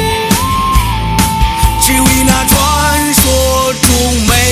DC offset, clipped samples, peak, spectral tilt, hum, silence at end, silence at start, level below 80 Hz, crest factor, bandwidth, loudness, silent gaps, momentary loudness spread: under 0.1%; 0.5%; 0 dBFS; -3.5 dB/octave; none; 0 s; 0 s; -18 dBFS; 10 dB; over 20 kHz; -10 LUFS; none; 4 LU